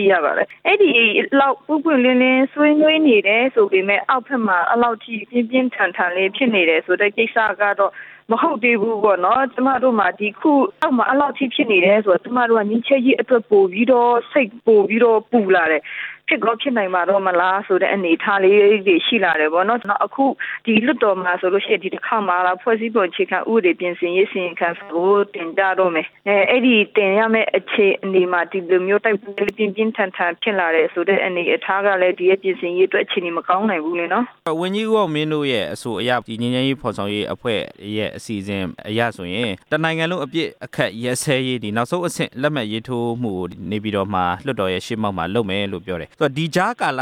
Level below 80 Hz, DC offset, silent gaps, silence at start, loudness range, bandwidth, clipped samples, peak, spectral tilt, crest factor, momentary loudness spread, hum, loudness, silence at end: -60 dBFS; under 0.1%; none; 0 s; 7 LU; 14 kHz; under 0.1%; -2 dBFS; -5.5 dB/octave; 16 dB; 9 LU; none; -18 LUFS; 0 s